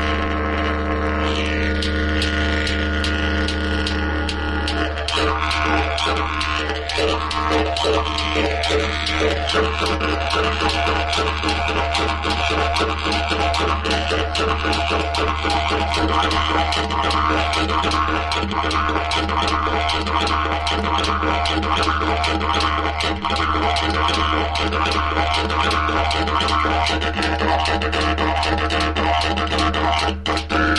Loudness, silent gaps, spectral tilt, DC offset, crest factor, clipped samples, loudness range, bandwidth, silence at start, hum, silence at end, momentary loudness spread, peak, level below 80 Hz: -19 LUFS; none; -4.5 dB/octave; under 0.1%; 16 dB; under 0.1%; 2 LU; 11.5 kHz; 0 s; none; 0 s; 3 LU; -4 dBFS; -28 dBFS